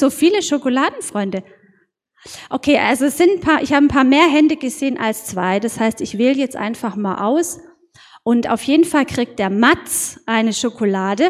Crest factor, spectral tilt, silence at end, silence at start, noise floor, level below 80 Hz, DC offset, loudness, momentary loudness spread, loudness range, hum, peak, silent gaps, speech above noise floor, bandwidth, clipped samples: 16 dB; -4 dB/octave; 0 s; 0 s; -60 dBFS; -48 dBFS; under 0.1%; -17 LUFS; 10 LU; 5 LU; none; 0 dBFS; none; 43 dB; 16 kHz; under 0.1%